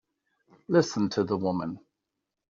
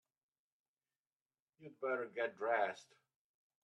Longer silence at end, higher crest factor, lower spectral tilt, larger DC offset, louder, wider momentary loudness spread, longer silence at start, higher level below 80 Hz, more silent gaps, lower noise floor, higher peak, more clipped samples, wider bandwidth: about the same, 0.75 s vs 0.8 s; about the same, 20 dB vs 22 dB; first, -6 dB/octave vs -4.5 dB/octave; neither; first, -28 LUFS vs -40 LUFS; second, 12 LU vs 21 LU; second, 0.7 s vs 1.6 s; first, -68 dBFS vs under -90 dBFS; neither; second, -85 dBFS vs under -90 dBFS; first, -10 dBFS vs -22 dBFS; neither; second, 7.4 kHz vs 10.5 kHz